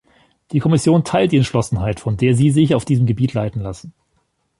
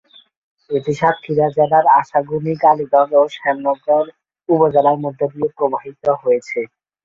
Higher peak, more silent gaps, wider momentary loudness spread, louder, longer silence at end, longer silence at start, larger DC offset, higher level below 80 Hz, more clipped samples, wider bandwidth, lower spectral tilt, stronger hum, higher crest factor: about the same, -2 dBFS vs 0 dBFS; neither; about the same, 10 LU vs 9 LU; about the same, -17 LUFS vs -16 LUFS; first, 0.7 s vs 0.4 s; second, 0.5 s vs 0.7 s; neither; first, -42 dBFS vs -60 dBFS; neither; first, 11.5 kHz vs 7.6 kHz; about the same, -7 dB/octave vs -7.5 dB/octave; neither; about the same, 14 dB vs 16 dB